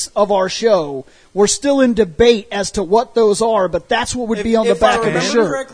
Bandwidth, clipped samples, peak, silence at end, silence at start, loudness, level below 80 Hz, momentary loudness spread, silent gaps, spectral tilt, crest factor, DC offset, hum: 11 kHz; under 0.1%; 0 dBFS; 0 s; 0 s; -15 LUFS; -40 dBFS; 7 LU; none; -4 dB/octave; 14 dB; under 0.1%; none